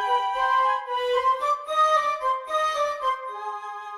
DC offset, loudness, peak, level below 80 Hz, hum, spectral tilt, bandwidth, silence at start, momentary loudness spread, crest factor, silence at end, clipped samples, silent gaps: under 0.1%; -24 LUFS; -12 dBFS; -62 dBFS; none; 0.5 dB/octave; 13.5 kHz; 0 s; 11 LU; 12 dB; 0 s; under 0.1%; none